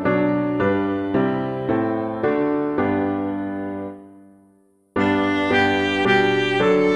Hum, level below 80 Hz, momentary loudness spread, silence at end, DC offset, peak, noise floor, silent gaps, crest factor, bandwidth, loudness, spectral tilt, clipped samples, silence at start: none; -54 dBFS; 10 LU; 0 s; under 0.1%; -4 dBFS; -57 dBFS; none; 16 dB; 9.6 kHz; -20 LUFS; -6.5 dB/octave; under 0.1%; 0 s